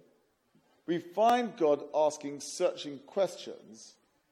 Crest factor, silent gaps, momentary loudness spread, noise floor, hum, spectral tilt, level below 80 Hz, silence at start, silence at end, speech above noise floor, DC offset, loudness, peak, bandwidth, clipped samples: 18 dB; none; 20 LU; -70 dBFS; none; -4 dB/octave; -84 dBFS; 0.9 s; 0.45 s; 39 dB; under 0.1%; -31 LUFS; -14 dBFS; 16.5 kHz; under 0.1%